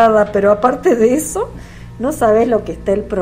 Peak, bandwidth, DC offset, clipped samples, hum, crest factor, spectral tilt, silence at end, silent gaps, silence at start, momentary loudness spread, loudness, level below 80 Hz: 0 dBFS; 16 kHz; under 0.1%; 0.1%; none; 14 dB; -5.5 dB/octave; 0 s; none; 0 s; 11 LU; -14 LUFS; -36 dBFS